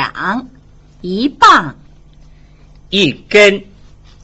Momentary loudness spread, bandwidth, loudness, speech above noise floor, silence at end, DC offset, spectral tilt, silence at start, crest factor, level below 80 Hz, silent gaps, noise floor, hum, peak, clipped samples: 16 LU; 8.2 kHz; -11 LUFS; 30 dB; 0.6 s; under 0.1%; -4 dB/octave; 0 s; 14 dB; -42 dBFS; none; -41 dBFS; none; 0 dBFS; under 0.1%